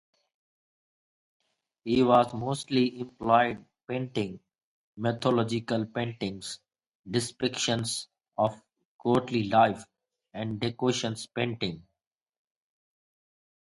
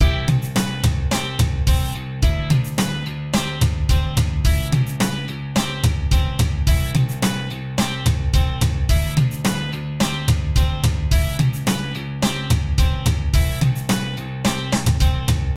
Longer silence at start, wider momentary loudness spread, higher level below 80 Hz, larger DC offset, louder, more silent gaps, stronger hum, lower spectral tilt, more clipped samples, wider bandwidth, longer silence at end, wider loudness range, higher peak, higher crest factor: first, 1.85 s vs 0 s; first, 14 LU vs 4 LU; second, -64 dBFS vs -22 dBFS; neither; second, -28 LUFS vs -20 LUFS; first, 4.63-4.93 s, 6.87-7.04 s, 8.85-8.99 s vs none; neither; about the same, -5 dB/octave vs -5 dB/octave; neither; second, 11.5 kHz vs 16.5 kHz; first, 1.9 s vs 0 s; first, 5 LU vs 1 LU; second, -8 dBFS vs -4 dBFS; first, 22 dB vs 14 dB